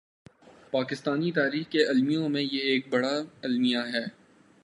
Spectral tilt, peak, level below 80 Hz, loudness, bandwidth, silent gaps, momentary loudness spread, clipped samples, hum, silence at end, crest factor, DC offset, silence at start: -5.5 dB/octave; -8 dBFS; -76 dBFS; -27 LUFS; 11 kHz; none; 7 LU; under 0.1%; none; 0.55 s; 20 dB; under 0.1%; 0.7 s